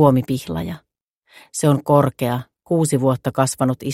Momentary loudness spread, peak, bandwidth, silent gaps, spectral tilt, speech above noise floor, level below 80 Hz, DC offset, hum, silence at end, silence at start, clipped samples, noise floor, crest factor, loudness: 12 LU; 0 dBFS; 15.5 kHz; 1.03-1.22 s; -6.5 dB/octave; 43 dB; -50 dBFS; under 0.1%; none; 0 s; 0 s; under 0.1%; -61 dBFS; 18 dB; -19 LUFS